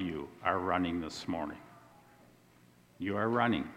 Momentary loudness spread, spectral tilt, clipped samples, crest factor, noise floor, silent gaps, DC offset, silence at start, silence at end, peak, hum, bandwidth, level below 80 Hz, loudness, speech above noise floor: 11 LU; -6 dB/octave; under 0.1%; 22 dB; -62 dBFS; none; under 0.1%; 0 s; 0 s; -14 dBFS; 60 Hz at -65 dBFS; 15.5 kHz; -62 dBFS; -34 LUFS; 30 dB